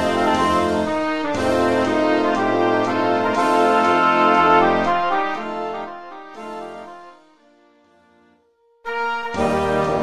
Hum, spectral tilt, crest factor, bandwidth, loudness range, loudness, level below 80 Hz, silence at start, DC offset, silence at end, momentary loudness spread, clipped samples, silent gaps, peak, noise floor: none; -5.5 dB/octave; 16 dB; 13.5 kHz; 16 LU; -18 LUFS; -46 dBFS; 0 s; 0.5%; 0 s; 18 LU; under 0.1%; none; -4 dBFS; -59 dBFS